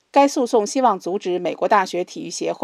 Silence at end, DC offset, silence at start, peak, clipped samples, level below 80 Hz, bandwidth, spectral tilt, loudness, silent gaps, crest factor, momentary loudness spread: 0.05 s; under 0.1%; 0.15 s; -2 dBFS; under 0.1%; -78 dBFS; 13.5 kHz; -4 dB/octave; -20 LUFS; none; 18 dB; 9 LU